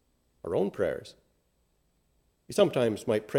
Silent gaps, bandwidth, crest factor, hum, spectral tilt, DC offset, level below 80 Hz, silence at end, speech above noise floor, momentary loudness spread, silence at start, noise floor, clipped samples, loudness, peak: none; 17 kHz; 22 dB; none; -5.5 dB/octave; under 0.1%; -66 dBFS; 0 s; 44 dB; 11 LU; 0.45 s; -72 dBFS; under 0.1%; -29 LUFS; -10 dBFS